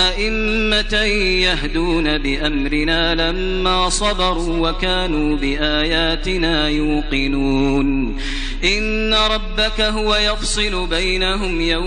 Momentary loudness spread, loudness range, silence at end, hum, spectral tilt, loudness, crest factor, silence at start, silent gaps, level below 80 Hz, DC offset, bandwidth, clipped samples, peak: 4 LU; 1 LU; 0 s; none; -3.5 dB/octave; -17 LUFS; 14 dB; 0 s; none; -24 dBFS; under 0.1%; 10 kHz; under 0.1%; -2 dBFS